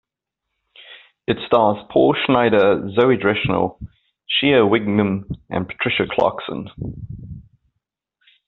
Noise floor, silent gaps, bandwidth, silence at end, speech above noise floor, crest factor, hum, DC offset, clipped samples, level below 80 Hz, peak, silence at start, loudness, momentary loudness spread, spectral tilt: -82 dBFS; none; 4.4 kHz; 1.05 s; 64 dB; 18 dB; none; under 0.1%; under 0.1%; -48 dBFS; -2 dBFS; 0.8 s; -18 LUFS; 16 LU; -4 dB/octave